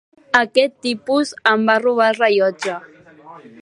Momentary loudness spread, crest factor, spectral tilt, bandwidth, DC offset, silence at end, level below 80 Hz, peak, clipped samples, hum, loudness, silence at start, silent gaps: 10 LU; 18 dB; -4 dB/octave; 11.5 kHz; under 0.1%; 0.25 s; -68 dBFS; 0 dBFS; under 0.1%; none; -17 LUFS; 0.35 s; none